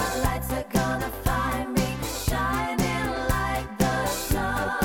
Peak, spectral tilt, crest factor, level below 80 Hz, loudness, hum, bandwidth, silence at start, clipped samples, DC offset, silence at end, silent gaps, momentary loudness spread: -8 dBFS; -4.5 dB/octave; 16 dB; -34 dBFS; -26 LUFS; none; 19 kHz; 0 s; under 0.1%; under 0.1%; 0 s; none; 2 LU